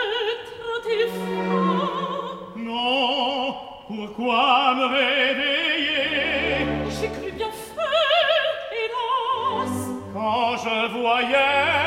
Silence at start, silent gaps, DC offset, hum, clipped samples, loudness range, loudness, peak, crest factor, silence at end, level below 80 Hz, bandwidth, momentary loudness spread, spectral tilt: 0 s; none; under 0.1%; none; under 0.1%; 4 LU; -22 LUFS; -6 dBFS; 18 dB; 0 s; -50 dBFS; 16 kHz; 12 LU; -4 dB/octave